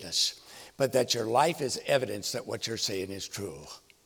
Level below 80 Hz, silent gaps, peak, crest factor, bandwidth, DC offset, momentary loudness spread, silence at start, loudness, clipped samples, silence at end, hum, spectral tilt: -66 dBFS; none; -10 dBFS; 20 dB; over 20 kHz; under 0.1%; 16 LU; 0 s; -29 LUFS; under 0.1%; 0.25 s; none; -3 dB/octave